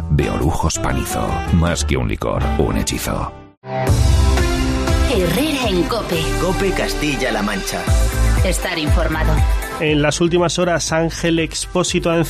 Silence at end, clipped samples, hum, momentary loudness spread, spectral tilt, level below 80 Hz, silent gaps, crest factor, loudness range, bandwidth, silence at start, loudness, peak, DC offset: 0 s; under 0.1%; none; 5 LU; -5 dB/octave; -22 dBFS; 3.57-3.62 s; 14 dB; 2 LU; 15.5 kHz; 0 s; -18 LUFS; -4 dBFS; under 0.1%